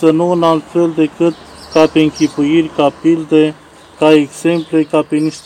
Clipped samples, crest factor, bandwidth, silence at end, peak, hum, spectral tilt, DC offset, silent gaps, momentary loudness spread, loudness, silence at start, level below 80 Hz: 0.5%; 12 dB; 10 kHz; 0.05 s; 0 dBFS; none; -6 dB/octave; under 0.1%; none; 6 LU; -13 LUFS; 0 s; -50 dBFS